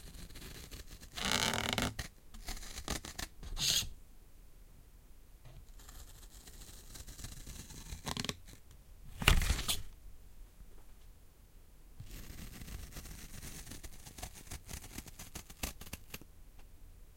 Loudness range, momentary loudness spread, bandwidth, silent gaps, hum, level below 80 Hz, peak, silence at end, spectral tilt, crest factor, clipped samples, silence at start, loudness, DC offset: 15 LU; 27 LU; 17 kHz; none; none; -46 dBFS; -6 dBFS; 0 s; -2.5 dB/octave; 34 dB; under 0.1%; 0 s; -39 LUFS; under 0.1%